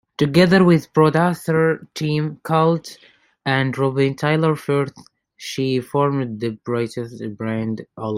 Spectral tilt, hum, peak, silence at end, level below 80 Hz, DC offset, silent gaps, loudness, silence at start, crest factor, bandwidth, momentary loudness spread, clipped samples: -7 dB/octave; none; -2 dBFS; 0 s; -58 dBFS; under 0.1%; none; -19 LUFS; 0.2 s; 18 dB; 15.5 kHz; 13 LU; under 0.1%